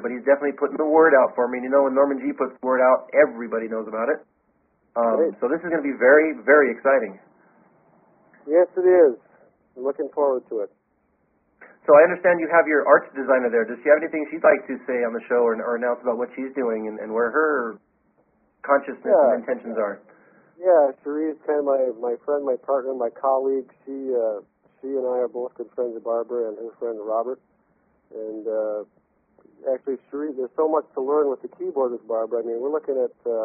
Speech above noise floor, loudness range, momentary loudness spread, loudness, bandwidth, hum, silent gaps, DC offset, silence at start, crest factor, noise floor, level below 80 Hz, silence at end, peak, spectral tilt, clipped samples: 46 dB; 8 LU; 14 LU; -22 LUFS; 2.9 kHz; none; none; under 0.1%; 0 s; 20 dB; -67 dBFS; -74 dBFS; 0 s; -2 dBFS; 1.5 dB/octave; under 0.1%